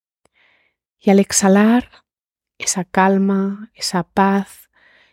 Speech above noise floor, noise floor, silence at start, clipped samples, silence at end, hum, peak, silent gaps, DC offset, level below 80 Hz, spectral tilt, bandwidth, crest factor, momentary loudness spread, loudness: 73 dB; -89 dBFS; 1.05 s; under 0.1%; 0.7 s; none; -2 dBFS; none; under 0.1%; -56 dBFS; -4.5 dB/octave; 15.5 kHz; 16 dB; 11 LU; -16 LUFS